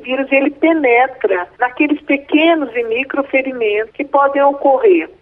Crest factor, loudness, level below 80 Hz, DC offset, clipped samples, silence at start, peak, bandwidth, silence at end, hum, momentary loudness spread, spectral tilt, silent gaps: 14 dB; -14 LUFS; -58 dBFS; under 0.1%; under 0.1%; 0 s; -2 dBFS; 3.9 kHz; 0.15 s; none; 6 LU; -7 dB/octave; none